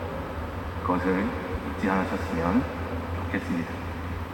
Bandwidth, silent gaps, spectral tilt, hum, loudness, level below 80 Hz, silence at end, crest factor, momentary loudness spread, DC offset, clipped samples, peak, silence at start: 19.5 kHz; none; -7.5 dB/octave; none; -29 LUFS; -44 dBFS; 0 s; 20 dB; 8 LU; under 0.1%; under 0.1%; -10 dBFS; 0 s